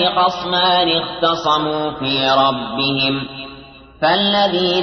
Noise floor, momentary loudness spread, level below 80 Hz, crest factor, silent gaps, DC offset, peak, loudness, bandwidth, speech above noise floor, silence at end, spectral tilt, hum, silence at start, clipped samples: -39 dBFS; 7 LU; -50 dBFS; 14 dB; none; under 0.1%; -2 dBFS; -16 LUFS; 6.4 kHz; 22 dB; 0 s; -5 dB/octave; none; 0 s; under 0.1%